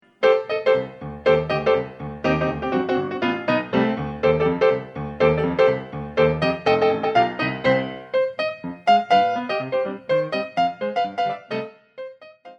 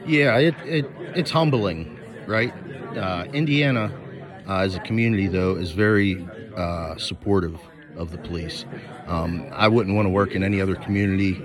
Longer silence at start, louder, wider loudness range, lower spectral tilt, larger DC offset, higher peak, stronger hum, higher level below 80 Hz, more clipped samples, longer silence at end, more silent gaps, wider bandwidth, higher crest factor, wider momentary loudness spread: first, 0.2 s vs 0 s; about the same, -21 LUFS vs -23 LUFS; about the same, 2 LU vs 3 LU; about the same, -7 dB/octave vs -7 dB/octave; neither; about the same, -4 dBFS vs -4 dBFS; neither; about the same, -48 dBFS vs -50 dBFS; neither; about the same, 0.05 s vs 0 s; neither; second, 7.2 kHz vs 12 kHz; about the same, 16 dB vs 20 dB; second, 8 LU vs 16 LU